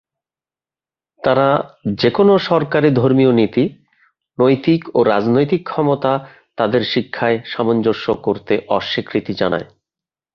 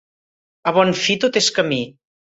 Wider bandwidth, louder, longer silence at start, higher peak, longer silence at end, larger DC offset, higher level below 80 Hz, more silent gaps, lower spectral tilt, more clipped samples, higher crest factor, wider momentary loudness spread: second, 6.6 kHz vs 8 kHz; about the same, -16 LUFS vs -18 LUFS; first, 1.25 s vs 0.65 s; about the same, -2 dBFS vs -2 dBFS; first, 0.7 s vs 0.35 s; neither; first, -54 dBFS vs -60 dBFS; neither; first, -8.5 dB/octave vs -3.5 dB/octave; neither; about the same, 16 dB vs 18 dB; about the same, 8 LU vs 9 LU